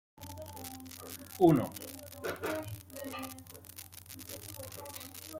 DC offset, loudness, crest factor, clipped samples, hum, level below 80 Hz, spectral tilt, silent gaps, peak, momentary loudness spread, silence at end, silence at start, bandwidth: under 0.1%; -36 LUFS; 26 dB; under 0.1%; none; -68 dBFS; -5.5 dB/octave; none; -12 dBFS; 21 LU; 0 s; 0.15 s; 17 kHz